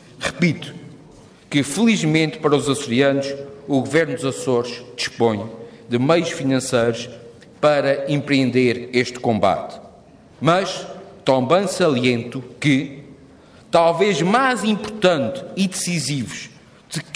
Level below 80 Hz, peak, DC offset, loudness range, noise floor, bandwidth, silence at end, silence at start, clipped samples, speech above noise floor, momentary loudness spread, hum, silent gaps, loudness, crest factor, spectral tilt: -58 dBFS; -2 dBFS; under 0.1%; 2 LU; -46 dBFS; 11 kHz; 0 s; 0.2 s; under 0.1%; 28 dB; 14 LU; none; none; -19 LUFS; 18 dB; -5 dB/octave